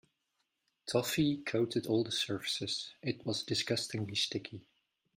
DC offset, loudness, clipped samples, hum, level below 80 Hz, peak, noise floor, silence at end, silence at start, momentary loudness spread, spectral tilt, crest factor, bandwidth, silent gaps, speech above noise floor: under 0.1%; -34 LUFS; under 0.1%; none; -70 dBFS; -18 dBFS; -82 dBFS; 0.55 s; 0.85 s; 8 LU; -4 dB/octave; 20 dB; 16 kHz; none; 47 dB